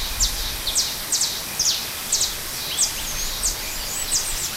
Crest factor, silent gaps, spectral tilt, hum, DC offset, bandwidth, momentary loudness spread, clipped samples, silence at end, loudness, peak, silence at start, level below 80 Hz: 18 dB; none; 0.5 dB/octave; none; under 0.1%; 16 kHz; 5 LU; under 0.1%; 0 s; -22 LUFS; -6 dBFS; 0 s; -36 dBFS